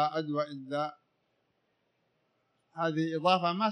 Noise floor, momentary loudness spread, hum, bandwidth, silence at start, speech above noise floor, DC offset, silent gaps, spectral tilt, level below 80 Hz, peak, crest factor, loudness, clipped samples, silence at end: -77 dBFS; 9 LU; none; 10 kHz; 0 s; 46 dB; under 0.1%; none; -6.5 dB/octave; -88 dBFS; -14 dBFS; 20 dB; -31 LUFS; under 0.1%; 0 s